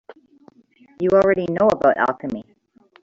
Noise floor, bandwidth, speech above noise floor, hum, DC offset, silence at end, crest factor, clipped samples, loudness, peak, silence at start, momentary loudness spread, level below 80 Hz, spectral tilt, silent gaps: -54 dBFS; 7.6 kHz; 36 dB; none; under 0.1%; 0.6 s; 18 dB; under 0.1%; -19 LUFS; -4 dBFS; 0.1 s; 13 LU; -54 dBFS; -7.5 dB/octave; none